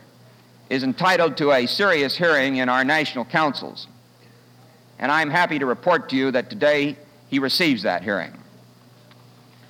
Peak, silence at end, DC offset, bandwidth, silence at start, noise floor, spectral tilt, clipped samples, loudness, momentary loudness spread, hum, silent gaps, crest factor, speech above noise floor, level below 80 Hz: -6 dBFS; 1.3 s; under 0.1%; 16.5 kHz; 0.7 s; -51 dBFS; -5 dB/octave; under 0.1%; -20 LUFS; 9 LU; none; none; 16 dB; 31 dB; -72 dBFS